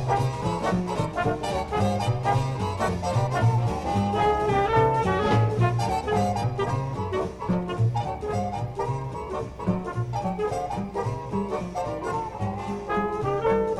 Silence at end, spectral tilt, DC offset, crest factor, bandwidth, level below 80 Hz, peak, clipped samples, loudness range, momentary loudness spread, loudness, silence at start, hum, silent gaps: 0 s; -7 dB/octave; under 0.1%; 16 dB; 12.5 kHz; -42 dBFS; -10 dBFS; under 0.1%; 6 LU; 8 LU; -26 LUFS; 0 s; none; none